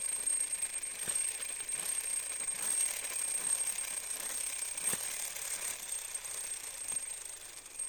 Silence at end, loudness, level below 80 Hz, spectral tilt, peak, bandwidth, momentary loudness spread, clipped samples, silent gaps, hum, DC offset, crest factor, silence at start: 0 s; -34 LUFS; -68 dBFS; 1.5 dB/octave; -18 dBFS; 17 kHz; 7 LU; under 0.1%; none; none; under 0.1%; 20 dB; 0 s